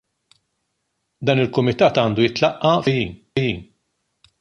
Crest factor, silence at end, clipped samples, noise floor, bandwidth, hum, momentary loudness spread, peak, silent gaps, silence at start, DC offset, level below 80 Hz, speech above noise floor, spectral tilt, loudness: 18 dB; 0.75 s; under 0.1%; -74 dBFS; 9.6 kHz; none; 8 LU; -2 dBFS; none; 1.2 s; under 0.1%; -50 dBFS; 56 dB; -6.5 dB/octave; -19 LUFS